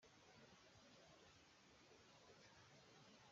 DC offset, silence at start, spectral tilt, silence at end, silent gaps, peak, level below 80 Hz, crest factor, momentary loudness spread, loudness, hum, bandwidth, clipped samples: under 0.1%; 0 s; -2.5 dB/octave; 0 s; none; -56 dBFS; -88 dBFS; 14 dB; 2 LU; -68 LUFS; none; 7.4 kHz; under 0.1%